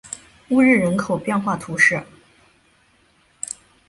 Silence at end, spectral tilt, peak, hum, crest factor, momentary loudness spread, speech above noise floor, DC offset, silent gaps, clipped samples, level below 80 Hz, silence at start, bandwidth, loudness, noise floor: 1.85 s; -5 dB/octave; -2 dBFS; none; 18 dB; 17 LU; 40 dB; under 0.1%; none; under 0.1%; -56 dBFS; 0.1 s; 11.5 kHz; -18 LUFS; -59 dBFS